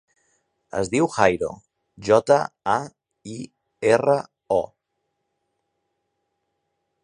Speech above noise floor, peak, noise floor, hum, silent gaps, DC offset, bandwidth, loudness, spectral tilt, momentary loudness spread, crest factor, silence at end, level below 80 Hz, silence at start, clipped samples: 56 dB; 0 dBFS; -77 dBFS; none; none; under 0.1%; 10.5 kHz; -22 LUFS; -5.5 dB/octave; 19 LU; 24 dB; 2.4 s; -58 dBFS; 0.75 s; under 0.1%